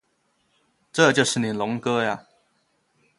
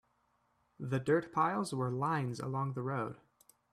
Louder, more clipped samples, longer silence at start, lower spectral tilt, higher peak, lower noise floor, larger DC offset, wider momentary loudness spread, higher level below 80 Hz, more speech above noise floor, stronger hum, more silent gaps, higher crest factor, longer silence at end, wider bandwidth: first, -22 LUFS vs -35 LUFS; neither; first, 0.95 s vs 0.8 s; second, -4 dB/octave vs -7 dB/octave; first, -2 dBFS vs -18 dBFS; second, -69 dBFS vs -76 dBFS; neither; about the same, 11 LU vs 9 LU; first, -66 dBFS vs -74 dBFS; first, 47 dB vs 41 dB; neither; neither; about the same, 22 dB vs 18 dB; first, 1 s vs 0.55 s; second, 11.5 kHz vs 13 kHz